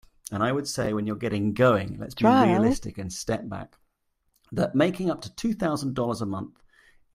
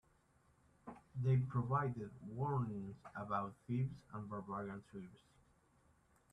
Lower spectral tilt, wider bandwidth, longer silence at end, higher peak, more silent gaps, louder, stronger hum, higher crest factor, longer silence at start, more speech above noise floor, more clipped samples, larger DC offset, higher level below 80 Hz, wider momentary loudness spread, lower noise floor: second, -6 dB/octave vs -9.5 dB/octave; first, 15 kHz vs 5 kHz; second, 0.65 s vs 1.15 s; first, -6 dBFS vs -24 dBFS; neither; first, -26 LUFS vs -42 LUFS; neither; about the same, 20 dB vs 18 dB; second, 0.3 s vs 0.85 s; first, 49 dB vs 32 dB; neither; neither; first, -52 dBFS vs -72 dBFS; second, 14 LU vs 18 LU; about the same, -73 dBFS vs -74 dBFS